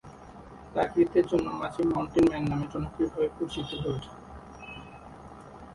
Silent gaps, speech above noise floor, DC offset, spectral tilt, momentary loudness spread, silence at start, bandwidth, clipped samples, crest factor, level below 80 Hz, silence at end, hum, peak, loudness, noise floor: none; 20 dB; under 0.1%; -7.5 dB/octave; 23 LU; 0.05 s; 11.5 kHz; under 0.1%; 18 dB; -50 dBFS; 0 s; none; -12 dBFS; -28 LUFS; -47 dBFS